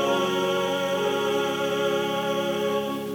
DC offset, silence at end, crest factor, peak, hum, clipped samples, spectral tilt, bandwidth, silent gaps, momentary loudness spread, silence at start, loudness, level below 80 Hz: under 0.1%; 0 s; 12 dB; -12 dBFS; none; under 0.1%; -4 dB/octave; over 20 kHz; none; 2 LU; 0 s; -25 LUFS; -64 dBFS